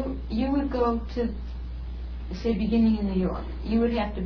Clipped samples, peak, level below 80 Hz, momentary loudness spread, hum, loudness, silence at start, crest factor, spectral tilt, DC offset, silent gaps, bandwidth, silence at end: under 0.1%; -12 dBFS; -34 dBFS; 14 LU; none; -27 LUFS; 0 s; 14 dB; -9 dB/octave; under 0.1%; none; 5.4 kHz; 0 s